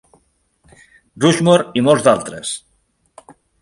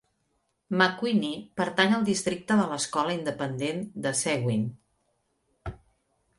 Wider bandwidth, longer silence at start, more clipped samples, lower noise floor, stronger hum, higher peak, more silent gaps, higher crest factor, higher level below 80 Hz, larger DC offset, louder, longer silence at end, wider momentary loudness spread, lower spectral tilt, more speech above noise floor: about the same, 11.5 kHz vs 11.5 kHz; first, 1.15 s vs 0.7 s; neither; second, -63 dBFS vs -75 dBFS; neither; first, 0 dBFS vs -6 dBFS; neither; about the same, 18 dB vs 22 dB; about the same, -56 dBFS vs -58 dBFS; neither; first, -15 LUFS vs -27 LUFS; first, 1.05 s vs 0.65 s; about the same, 13 LU vs 11 LU; about the same, -5 dB/octave vs -4.5 dB/octave; about the same, 48 dB vs 48 dB